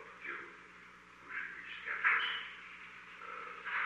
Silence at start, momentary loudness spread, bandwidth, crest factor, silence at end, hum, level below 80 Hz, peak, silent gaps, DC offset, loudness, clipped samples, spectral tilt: 0 s; 23 LU; 11.5 kHz; 24 dB; 0 s; 60 Hz at -75 dBFS; -78 dBFS; -18 dBFS; none; under 0.1%; -38 LUFS; under 0.1%; -2 dB/octave